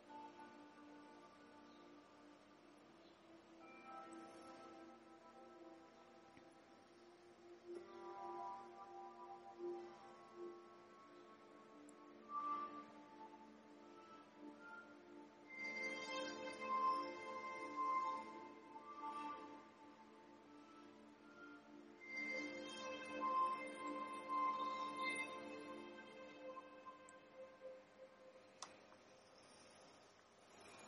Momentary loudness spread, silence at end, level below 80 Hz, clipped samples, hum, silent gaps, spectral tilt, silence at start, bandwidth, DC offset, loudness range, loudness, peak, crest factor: 21 LU; 0 s; under -90 dBFS; under 0.1%; none; none; -3 dB/octave; 0 s; 11 kHz; under 0.1%; 16 LU; -49 LUFS; -32 dBFS; 20 dB